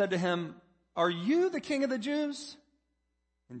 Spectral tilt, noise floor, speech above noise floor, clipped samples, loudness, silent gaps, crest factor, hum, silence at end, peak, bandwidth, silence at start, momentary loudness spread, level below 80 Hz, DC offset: -5.5 dB/octave; -80 dBFS; 49 dB; under 0.1%; -31 LUFS; none; 18 dB; none; 0 s; -14 dBFS; 8.8 kHz; 0 s; 14 LU; -76 dBFS; under 0.1%